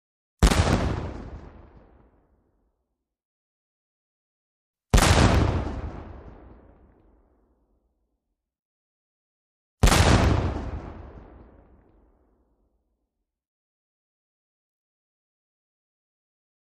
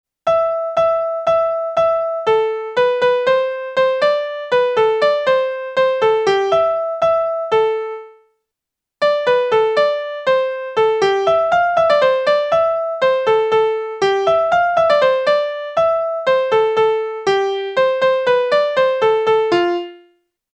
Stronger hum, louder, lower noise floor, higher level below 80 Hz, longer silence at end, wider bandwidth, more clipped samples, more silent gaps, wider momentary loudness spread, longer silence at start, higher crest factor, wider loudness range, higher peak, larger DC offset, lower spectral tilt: neither; second, -22 LUFS vs -16 LUFS; about the same, -81 dBFS vs -83 dBFS; first, -32 dBFS vs -58 dBFS; first, 5.5 s vs 0.55 s; first, 13 kHz vs 8.8 kHz; neither; first, 3.25-4.74 s, 8.59-9.77 s vs none; first, 25 LU vs 4 LU; first, 0.4 s vs 0.25 s; first, 24 dB vs 14 dB; first, 13 LU vs 3 LU; about the same, -4 dBFS vs -2 dBFS; neither; about the same, -5 dB/octave vs -4 dB/octave